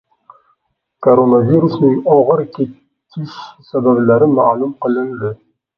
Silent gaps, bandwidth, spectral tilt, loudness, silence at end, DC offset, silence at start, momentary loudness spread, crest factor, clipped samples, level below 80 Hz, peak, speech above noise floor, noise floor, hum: none; 6 kHz; -10.5 dB/octave; -13 LUFS; 0.45 s; under 0.1%; 1 s; 17 LU; 14 dB; under 0.1%; -58 dBFS; 0 dBFS; 54 dB; -67 dBFS; none